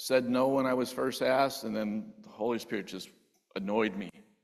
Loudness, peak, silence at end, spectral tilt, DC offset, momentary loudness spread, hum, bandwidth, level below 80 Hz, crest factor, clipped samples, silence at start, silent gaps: -31 LUFS; -12 dBFS; 0.25 s; -5 dB/octave; under 0.1%; 16 LU; none; 14 kHz; -72 dBFS; 18 dB; under 0.1%; 0 s; none